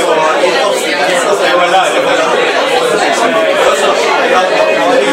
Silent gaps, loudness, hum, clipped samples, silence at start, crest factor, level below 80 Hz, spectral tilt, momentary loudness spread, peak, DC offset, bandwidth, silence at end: none; -10 LUFS; none; 0.1%; 0 s; 10 dB; -56 dBFS; -2 dB/octave; 2 LU; 0 dBFS; under 0.1%; 16.5 kHz; 0 s